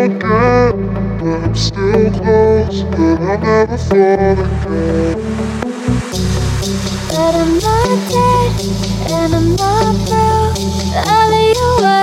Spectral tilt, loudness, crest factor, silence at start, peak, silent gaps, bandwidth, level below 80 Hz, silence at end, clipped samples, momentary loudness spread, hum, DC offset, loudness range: -6 dB/octave; -13 LUFS; 12 dB; 0 s; 0 dBFS; none; 16.5 kHz; -26 dBFS; 0 s; under 0.1%; 7 LU; none; under 0.1%; 3 LU